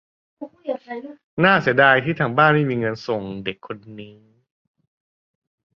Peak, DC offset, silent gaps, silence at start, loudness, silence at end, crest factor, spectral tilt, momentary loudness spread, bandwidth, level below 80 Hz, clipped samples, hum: -2 dBFS; under 0.1%; 1.24-1.37 s; 0.4 s; -19 LUFS; 1.7 s; 20 dB; -7.5 dB/octave; 21 LU; 6.8 kHz; -60 dBFS; under 0.1%; none